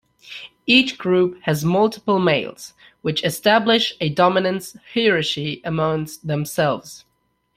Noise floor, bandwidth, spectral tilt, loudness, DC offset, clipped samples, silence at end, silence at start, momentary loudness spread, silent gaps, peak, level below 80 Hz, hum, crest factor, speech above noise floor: -40 dBFS; 16 kHz; -5 dB/octave; -19 LUFS; under 0.1%; under 0.1%; 0.6 s; 0.25 s; 15 LU; none; -2 dBFS; -58 dBFS; none; 20 dB; 20 dB